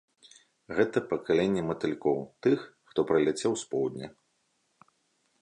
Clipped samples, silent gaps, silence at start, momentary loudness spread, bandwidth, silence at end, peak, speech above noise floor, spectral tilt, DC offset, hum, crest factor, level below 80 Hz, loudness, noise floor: under 0.1%; none; 0.7 s; 8 LU; 11 kHz; 1.3 s; -12 dBFS; 46 dB; -5.5 dB/octave; under 0.1%; none; 18 dB; -66 dBFS; -29 LUFS; -74 dBFS